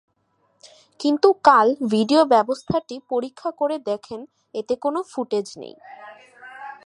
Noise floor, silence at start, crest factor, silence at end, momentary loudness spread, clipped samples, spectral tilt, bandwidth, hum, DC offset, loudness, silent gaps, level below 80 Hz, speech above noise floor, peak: -67 dBFS; 1 s; 22 dB; 0.15 s; 23 LU; under 0.1%; -5.5 dB/octave; 11.5 kHz; none; under 0.1%; -20 LUFS; none; -62 dBFS; 46 dB; 0 dBFS